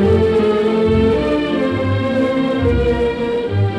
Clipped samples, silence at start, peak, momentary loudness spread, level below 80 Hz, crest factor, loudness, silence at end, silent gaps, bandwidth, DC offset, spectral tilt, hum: under 0.1%; 0 s; -2 dBFS; 4 LU; -30 dBFS; 12 dB; -16 LUFS; 0 s; none; 10 kHz; under 0.1%; -8 dB/octave; none